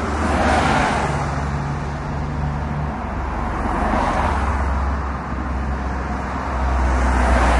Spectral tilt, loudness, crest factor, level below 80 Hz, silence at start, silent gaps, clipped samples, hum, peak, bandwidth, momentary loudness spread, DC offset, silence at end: -6 dB/octave; -21 LUFS; 16 dB; -24 dBFS; 0 s; none; under 0.1%; none; -4 dBFS; 11.5 kHz; 8 LU; under 0.1%; 0 s